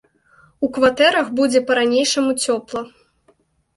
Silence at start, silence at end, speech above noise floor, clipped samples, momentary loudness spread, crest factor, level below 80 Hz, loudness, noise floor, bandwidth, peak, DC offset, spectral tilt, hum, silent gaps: 0.6 s; 0.9 s; 42 dB; under 0.1%; 13 LU; 18 dB; -58 dBFS; -17 LUFS; -60 dBFS; 11.5 kHz; -2 dBFS; under 0.1%; -2 dB/octave; none; none